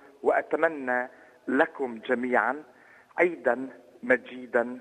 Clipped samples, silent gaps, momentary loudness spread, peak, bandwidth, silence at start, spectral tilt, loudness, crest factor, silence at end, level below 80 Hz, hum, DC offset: under 0.1%; none; 14 LU; -6 dBFS; 10 kHz; 0.25 s; -6 dB/octave; -27 LUFS; 22 dB; 0 s; -76 dBFS; none; under 0.1%